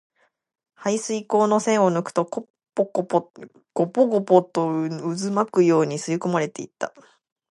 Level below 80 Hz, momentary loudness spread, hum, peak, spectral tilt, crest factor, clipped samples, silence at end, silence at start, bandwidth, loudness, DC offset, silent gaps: -74 dBFS; 13 LU; none; -2 dBFS; -6 dB/octave; 20 dB; under 0.1%; 0.6 s; 0.8 s; 11.5 kHz; -22 LUFS; under 0.1%; 2.50-2.54 s